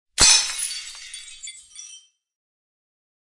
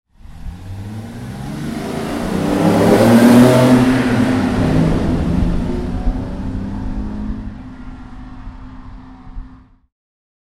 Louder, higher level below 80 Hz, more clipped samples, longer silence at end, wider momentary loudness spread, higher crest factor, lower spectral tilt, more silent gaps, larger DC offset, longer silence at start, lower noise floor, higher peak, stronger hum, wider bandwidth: about the same, -16 LUFS vs -15 LUFS; second, -44 dBFS vs -28 dBFS; neither; first, 1.4 s vs 0.9 s; about the same, 26 LU vs 26 LU; first, 24 dB vs 16 dB; second, 1.5 dB/octave vs -7 dB/octave; neither; neither; about the same, 0.2 s vs 0.25 s; first, -48 dBFS vs -41 dBFS; about the same, -2 dBFS vs 0 dBFS; neither; second, 11.5 kHz vs 16 kHz